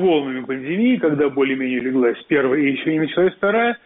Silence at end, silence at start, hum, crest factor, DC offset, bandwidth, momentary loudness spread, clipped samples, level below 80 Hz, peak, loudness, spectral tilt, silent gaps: 0.1 s; 0 s; none; 12 dB; under 0.1%; 4 kHz; 4 LU; under 0.1%; -60 dBFS; -6 dBFS; -19 LUFS; -4.5 dB/octave; none